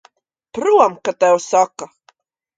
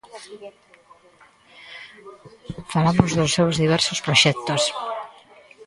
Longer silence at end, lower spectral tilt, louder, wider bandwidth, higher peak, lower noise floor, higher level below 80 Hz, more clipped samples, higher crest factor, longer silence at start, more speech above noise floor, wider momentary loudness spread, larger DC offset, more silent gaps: first, 0.75 s vs 0.55 s; about the same, -3.5 dB/octave vs -4 dB/octave; first, -16 LUFS vs -19 LUFS; second, 9.4 kHz vs 11.5 kHz; about the same, 0 dBFS vs 0 dBFS; about the same, -57 dBFS vs -54 dBFS; second, -64 dBFS vs -50 dBFS; neither; about the same, 18 dB vs 22 dB; first, 0.55 s vs 0.15 s; first, 42 dB vs 32 dB; second, 19 LU vs 24 LU; neither; neither